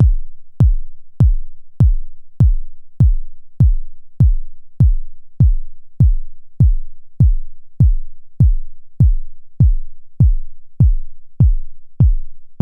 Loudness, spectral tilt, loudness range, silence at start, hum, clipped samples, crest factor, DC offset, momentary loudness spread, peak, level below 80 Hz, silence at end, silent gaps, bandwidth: -17 LUFS; -12 dB/octave; 0 LU; 0 s; none; under 0.1%; 12 dB; under 0.1%; 11 LU; -2 dBFS; -16 dBFS; 0 s; none; 1.5 kHz